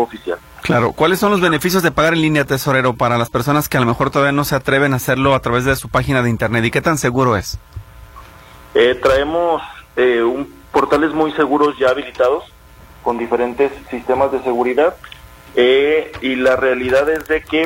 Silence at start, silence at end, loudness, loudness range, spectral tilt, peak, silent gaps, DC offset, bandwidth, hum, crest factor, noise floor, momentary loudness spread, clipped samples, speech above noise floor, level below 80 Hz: 0 s; 0 s; -16 LUFS; 3 LU; -5.5 dB/octave; -2 dBFS; none; under 0.1%; 16.5 kHz; none; 14 dB; -41 dBFS; 8 LU; under 0.1%; 26 dB; -40 dBFS